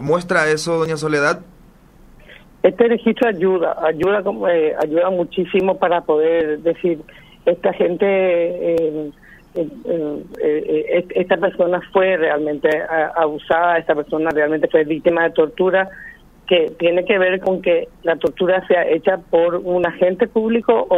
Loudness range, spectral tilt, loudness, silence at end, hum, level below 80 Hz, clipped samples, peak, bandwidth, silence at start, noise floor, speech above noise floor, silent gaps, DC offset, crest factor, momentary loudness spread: 2 LU; -6 dB/octave; -18 LUFS; 0 s; none; -50 dBFS; under 0.1%; 0 dBFS; 11.5 kHz; 0 s; -46 dBFS; 29 dB; none; under 0.1%; 18 dB; 6 LU